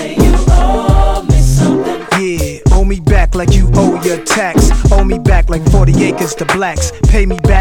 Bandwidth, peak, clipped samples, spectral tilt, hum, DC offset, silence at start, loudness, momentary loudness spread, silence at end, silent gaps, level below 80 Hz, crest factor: 15 kHz; 0 dBFS; 0.6%; -6 dB/octave; none; under 0.1%; 0 s; -12 LUFS; 5 LU; 0 s; none; -12 dBFS; 10 dB